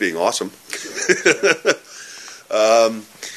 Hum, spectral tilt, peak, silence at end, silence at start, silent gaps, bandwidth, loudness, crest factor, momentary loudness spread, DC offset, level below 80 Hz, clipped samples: none; -2 dB/octave; 0 dBFS; 0 s; 0 s; none; 14 kHz; -18 LUFS; 20 dB; 19 LU; under 0.1%; -68 dBFS; under 0.1%